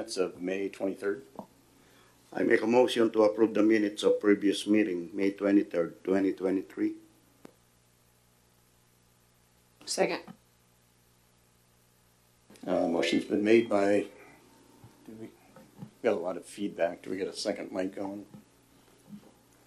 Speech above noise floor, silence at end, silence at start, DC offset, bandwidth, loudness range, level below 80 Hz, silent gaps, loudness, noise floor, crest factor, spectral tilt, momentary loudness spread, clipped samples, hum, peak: 37 dB; 0.5 s; 0 s; under 0.1%; 13 kHz; 12 LU; -74 dBFS; none; -29 LUFS; -65 dBFS; 22 dB; -5 dB/octave; 20 LU; under 0.1%; 60 Hz at -65 dBFS; -10 dBFS